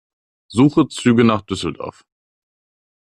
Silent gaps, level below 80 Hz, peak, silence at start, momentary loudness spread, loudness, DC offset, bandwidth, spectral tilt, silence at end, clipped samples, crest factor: none; -52 dBFS; -2 dBFS; 0.5 s; 14 LU; -17 LUFS; under 0.1%; 11 kHz; -6.5 dB/octave; 1.1 s; under 0.1%; 16 dB